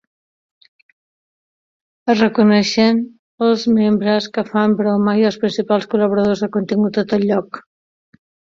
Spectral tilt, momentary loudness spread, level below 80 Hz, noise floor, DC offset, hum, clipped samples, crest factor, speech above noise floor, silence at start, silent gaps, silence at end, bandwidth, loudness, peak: -6 dB/octave; 7 LU; -58 dBFS; under -90 dBFS; under 0.1%; none; under 0.1%; 16 dB; over 75 dB; 2.05 s; 3.19-3.38 s; 0.95 s; 7.4 kHz; -16 LUFS; -2 dBFS